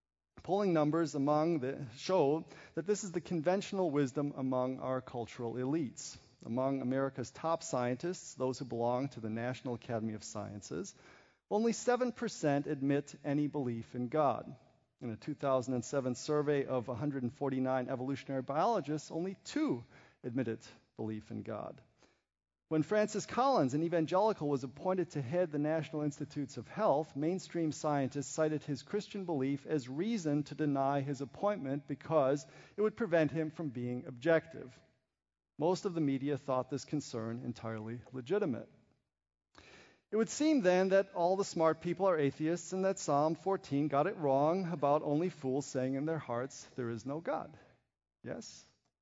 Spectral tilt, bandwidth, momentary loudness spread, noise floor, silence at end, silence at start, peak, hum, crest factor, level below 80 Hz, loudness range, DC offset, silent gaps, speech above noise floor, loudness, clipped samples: -6 dB/octave; 7.6 kHz; 11 LU; -61 dBFS; 0.4 s; 0.35 s; -16 dBFS; none; 20 dB; -76 dBFS; 6 LU; under 0.1%; none; 26 dB; -35 LUFS; under 0.1%